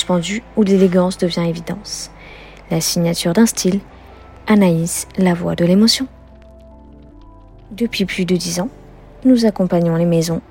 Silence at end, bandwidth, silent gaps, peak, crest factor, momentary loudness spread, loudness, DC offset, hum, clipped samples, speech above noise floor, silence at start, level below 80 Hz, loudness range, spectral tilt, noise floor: 0.1 s; 16.5 kHz; none; 0 dBFS; 16 dB; 14 LU; -16 LUFS; under 0.1%; none; under 0.1%; 25 dB; 0 s; -44 dBFS; 4 LU; -5 dB/octave; -41 dBFS